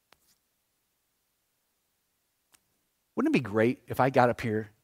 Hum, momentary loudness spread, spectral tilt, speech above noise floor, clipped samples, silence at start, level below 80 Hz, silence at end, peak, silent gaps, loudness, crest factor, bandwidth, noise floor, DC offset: none; 8 LU; -7 dB/octave; 50 dB; under 0.1%; 3.15 s; -64 dBFS; 0.15 s; -6 dBFS; none; -27 LUFS; 26 dB; 16 kHz; -77 dBFS; under 0.1%